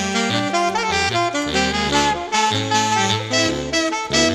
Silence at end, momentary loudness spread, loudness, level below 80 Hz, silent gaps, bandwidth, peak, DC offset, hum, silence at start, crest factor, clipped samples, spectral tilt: 0 s; 2 LU; -18 LUFS; -42 dBFS; none; 13.5 kHz; -2 dBFS; under 0.1%; none; 0 s; 16 dB; under 0.1%; -3 dB/octave